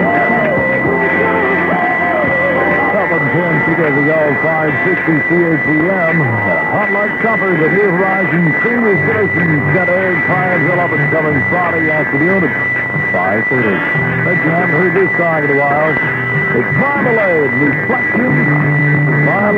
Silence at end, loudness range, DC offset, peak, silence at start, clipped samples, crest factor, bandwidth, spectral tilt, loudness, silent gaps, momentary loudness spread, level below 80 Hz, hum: 0 s; 1 LU; under 0.1%; 0 dBFS; 0 s; under 0.1%; 12 dB; 6.4 kHz; -9 dB/octave; -12 LUFS; none; 2 LU; -48 dBFS; none